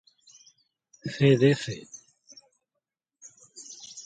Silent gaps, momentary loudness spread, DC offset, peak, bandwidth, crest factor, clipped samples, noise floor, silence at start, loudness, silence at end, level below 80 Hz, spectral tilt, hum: none; 27 LU; under 0.1%; -8 dBFS; 9.2 kHz; 22 dB; under 0.1%; -85 dBFS; 1.05 s; -24 LUFS; 0.05 s; -68 dBFS; -6 dB/octave; none